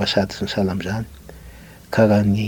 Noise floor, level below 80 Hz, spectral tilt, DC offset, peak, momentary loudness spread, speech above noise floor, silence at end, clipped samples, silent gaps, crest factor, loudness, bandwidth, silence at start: -41 dBFS; -44 dBFS; -6.5 dB/octave; under 0.1%; -2 dBFS; 21 LU; 23 dB; 0 s; under 0.1%; none; 18 dB; -20 LUFS; 19 kHz; 0 s